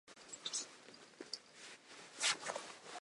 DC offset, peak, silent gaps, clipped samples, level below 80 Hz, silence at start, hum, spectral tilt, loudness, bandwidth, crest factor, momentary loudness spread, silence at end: under 0.1%; -22 dBFS; none; under 0.1%; under -90 dBFS; 0.05 s; none; 1 dB/octave; -42 LUFS; 11.5 kHz; 24 dB; 19 LU; 0 s